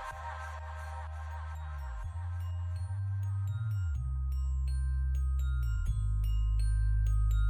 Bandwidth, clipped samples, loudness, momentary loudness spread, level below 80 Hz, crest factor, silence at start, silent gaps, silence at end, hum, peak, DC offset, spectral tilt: 9.8 kHz; under 0.1%; -35 LUFS; 10 LU; -34 dBFS; 10 dB; 0 s; none; 0 s; none; -22 dBFS; under 0.1%; -6.5 dB/octave